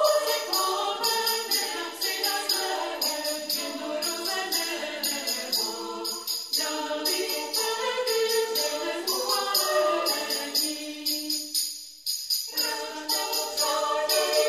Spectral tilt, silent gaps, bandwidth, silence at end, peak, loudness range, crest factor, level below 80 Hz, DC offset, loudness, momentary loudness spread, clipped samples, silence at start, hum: 1 dB/octave; none; 15.5 kHz; 0 s; -10 dBFS; 2 LU; 18 dB; -76 dBFS; under 0.1%; -26 LUFS; 6 LU; under 0.1%; 0 s; none